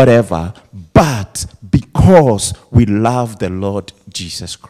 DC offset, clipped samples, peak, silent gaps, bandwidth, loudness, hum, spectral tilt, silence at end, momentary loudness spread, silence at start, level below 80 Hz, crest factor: under 0.1%; 0.7%; 0 dBFS; none; 15 kHz; -13 LUFS; none; -6 dB/octave; 0.15 s; 15 LU; 0 s; -30 dBFS; 14 dB